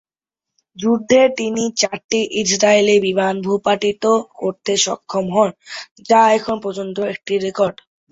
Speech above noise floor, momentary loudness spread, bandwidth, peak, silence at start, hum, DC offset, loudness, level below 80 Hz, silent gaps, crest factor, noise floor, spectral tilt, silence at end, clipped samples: 69 dB; 10 LU; 8 kHz; -2 dBFS; 0.75 s; none; under 0.1%; -17 LUFS; -58 dBFS; 2.04-2.09 s, 5.91-5.96 s; 16 dB; -86 dBFS; -3.5 dB/octave; 0.4 s; under 0.1%